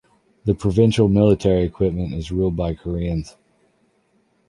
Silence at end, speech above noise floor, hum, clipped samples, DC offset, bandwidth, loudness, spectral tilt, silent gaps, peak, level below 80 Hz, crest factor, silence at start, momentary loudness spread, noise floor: 1.2 s; 45 dB; none; under 0.1%; under 0.1%; 11.5 kHz; -20 LUFS; -8 dB/octave; none; -4 dBFS; -36 dBFS; 18 dB; 0.45 s; 11 LU; -63 dBFS